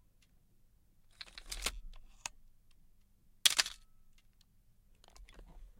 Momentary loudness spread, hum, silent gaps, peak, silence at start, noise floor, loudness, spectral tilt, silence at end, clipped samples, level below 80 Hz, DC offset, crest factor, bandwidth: 24 LU; none; none; -8 dBFS; 1.2 s; -67 dBFS; -33 LUFS; 1.5 dB/octave; 0.1 s; under 0.1%; -56 dBFS; under 0.1%; 34 dB; 16.5 kHz